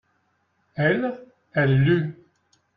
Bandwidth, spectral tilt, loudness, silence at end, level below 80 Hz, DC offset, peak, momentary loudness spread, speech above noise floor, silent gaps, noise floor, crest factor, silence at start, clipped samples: 4.9 kHz; -9.5 dB/octave; -23 LUFS; 0.65 s; -54 dBFS; under 0.1%; -8 dBFS; 16 LU; 48 dB; none; -69 dBFS; 18 dB; 0.75 s; under 0.1%